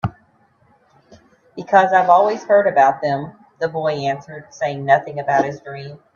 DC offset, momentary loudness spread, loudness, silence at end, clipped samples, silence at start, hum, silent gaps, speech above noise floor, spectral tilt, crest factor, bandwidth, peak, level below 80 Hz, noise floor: under 0.1%; 20 LU; -17 LUFS; 0.2 s; under 0.1%; 0.05 s; none; none; 40 dB; -6 dB/octave; 18 dB; 7.2 kHz; 0 dBFS; -56 dBFS; -57 dBFS